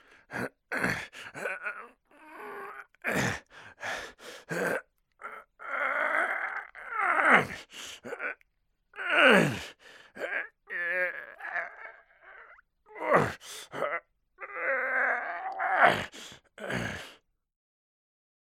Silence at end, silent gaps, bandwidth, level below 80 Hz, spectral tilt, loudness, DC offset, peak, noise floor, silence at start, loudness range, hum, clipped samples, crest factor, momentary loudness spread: 1.35 s; none; 16.5 kHz; -66 dBFS; -4 dB/octave; -29 LUFS; under 0.1%; -4 dBFS; -75 dBFS; 0.3 s; 9 LU; none; under 0.1%; 28 dB; 21 LU